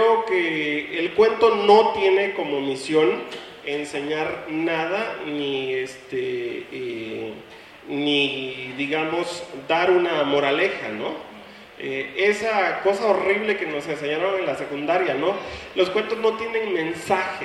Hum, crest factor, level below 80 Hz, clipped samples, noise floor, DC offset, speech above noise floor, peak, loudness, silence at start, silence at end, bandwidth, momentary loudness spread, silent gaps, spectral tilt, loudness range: none; 20 dB; -60 dBFS; under 0.1%; -43 dBFS; under 0.1%; 20 dB; -2 dBFS; -22 LUFS; 0 s; 0 s; 12 kHz; 12 LU; none; -4.5 dB/octave; 7 LU